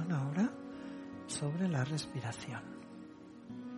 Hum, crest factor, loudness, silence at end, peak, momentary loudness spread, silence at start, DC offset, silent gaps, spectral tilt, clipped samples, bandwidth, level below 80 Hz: none; 16 dB; -38 LUFS; 0 s; -22 dBFS; 16 LU; 0 s; under 0.1%; none; -5.5 dB/octave; under 0.1%; 11.5 kHz; -72 dBFS